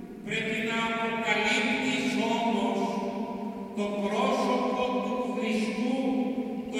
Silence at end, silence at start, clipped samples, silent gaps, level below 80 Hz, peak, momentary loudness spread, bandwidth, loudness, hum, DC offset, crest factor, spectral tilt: 0 s; 0 s; under 0.1%; none; -64 dBFS; -12 dBFS; 8 LU; 15 kHz; -28 LUFS; none; under 0.1%; 16 dB; -4.5 dB/octave